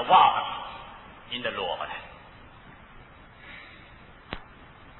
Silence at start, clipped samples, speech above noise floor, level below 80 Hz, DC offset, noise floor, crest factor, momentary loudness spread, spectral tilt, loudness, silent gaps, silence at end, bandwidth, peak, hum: 0 s; under 0.1%; 27 dB; -54 dBFS; under 0.1%; -50 dBFS; 22 dB; 26 LU; -6.5 dB/octave; -26 LUFS; none; 0 s; 4.2 kHz; -6 dBFS; none